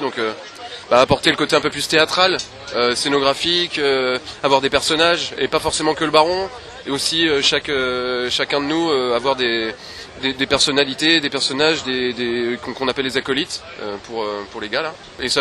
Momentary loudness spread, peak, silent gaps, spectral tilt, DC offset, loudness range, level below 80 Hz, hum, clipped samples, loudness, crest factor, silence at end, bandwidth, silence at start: 11 LU; 0 dBFS; none; -3 dB/octave; under 0.1%; 3 LU; -48 dBFS; none; under 0.1%; -18 LUFS; 18 dB; 0 s; 13 kHz; 0 s